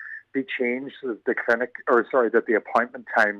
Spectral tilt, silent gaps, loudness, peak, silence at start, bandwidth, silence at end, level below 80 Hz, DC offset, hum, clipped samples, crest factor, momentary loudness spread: -5.5 dB/octave; none; -24 LUFS; -8 dBFS; 0 s; 10 kHz; 0 s; -74 dBFS; under 0.1%; none; under 0.1%; 16 dB; 9 LU